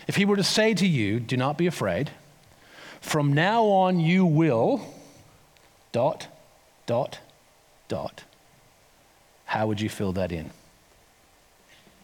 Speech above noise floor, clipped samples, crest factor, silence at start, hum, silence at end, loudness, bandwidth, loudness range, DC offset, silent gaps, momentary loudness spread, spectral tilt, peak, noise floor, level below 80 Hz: 35 dB; under 0.1%; 18 dB; 0 s; none; 1.5 s; -24 LUFS; 18.5 kHz; 9 LU; under 0.1%; none; 18 LU; -5.5 dB/octave; -8 dBFS; -59 dBFS; -64 dBFS